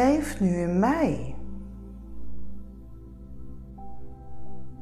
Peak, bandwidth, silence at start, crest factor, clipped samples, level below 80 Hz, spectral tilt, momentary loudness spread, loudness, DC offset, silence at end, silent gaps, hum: -10 dBFS; 13.5 kHz; 0 s; 16 dB; under 0.1%; -42 dBFS; -7 dB/octave; 23 LU; -25 LUFS; under 0.1%; 0 s; none; none